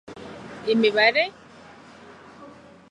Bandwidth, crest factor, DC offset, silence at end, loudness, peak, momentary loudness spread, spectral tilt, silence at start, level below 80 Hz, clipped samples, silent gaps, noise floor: 10.5 kHz; 22 dB; under 0.1%; 0.4 s; -21 LUFS; -4 dBFS; 22 LU; -5 dB/octave; 0.1 s; -64 dBFS; under 0.1%; none; -47 dBFS